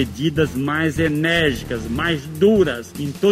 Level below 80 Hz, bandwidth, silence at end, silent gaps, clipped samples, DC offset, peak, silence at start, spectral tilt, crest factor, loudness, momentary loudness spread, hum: -40 dBFS; 16 kHz; 0 s; none; under 0.1%; under 0.1%; -4 dBFS; 0 s; -6 dB/octave; 14 dB; -19 LUFS; 9 LU; none